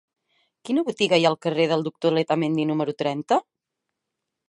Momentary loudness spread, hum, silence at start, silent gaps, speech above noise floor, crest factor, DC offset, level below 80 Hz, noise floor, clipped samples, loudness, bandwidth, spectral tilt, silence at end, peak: 6 LU; none; 0.65 s; none; 61 dB; 20 dB; under 0.1%; -74 dBFS; -83 dBFS; under 0.1%; -23 LUFS; 11 kHz; -5.5 dB/octave; 1.05 s; -4 dBFS